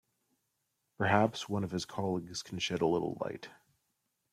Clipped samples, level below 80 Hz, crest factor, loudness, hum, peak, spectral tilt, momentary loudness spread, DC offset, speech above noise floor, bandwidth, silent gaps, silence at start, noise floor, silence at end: under 0.1%; -70 dBFS; 22 dB; -34 LUFS; none; -14 dBFS; -5 dB/octave; 12 LU; under 0.1%; 49 dB; 15 kHz; none; 1 s; -82 dBFS; 0.8 s